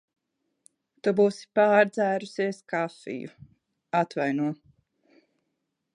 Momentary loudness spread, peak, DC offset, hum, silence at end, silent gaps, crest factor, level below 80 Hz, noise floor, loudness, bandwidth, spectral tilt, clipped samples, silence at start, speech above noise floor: 16 LU; -8 dBFS; under 0.1%; none; 1.4 s; none; 20 dB; -76 dBFS; -80 dBFS; -26 LUFS; 11 kHz; -6.5 dB/octave; under 0.1%; 1.05 s; 55 dB